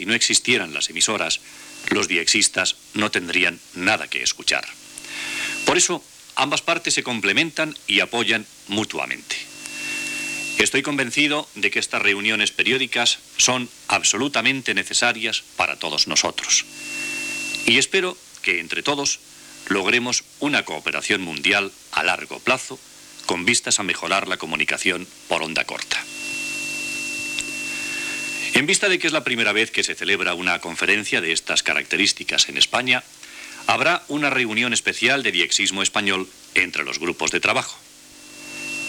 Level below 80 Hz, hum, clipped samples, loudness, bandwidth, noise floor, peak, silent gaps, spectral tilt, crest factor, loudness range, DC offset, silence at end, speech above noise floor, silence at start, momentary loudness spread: -60 dBFS; none; under 0.1%; -20 LUFS; over 20 kHz; -44 dBFS; -4 dBFS; none; -1 dB/octave; 18 dB; 3 LU; under 0.1%; 0 s; 22 dB; 0 s; 9 LU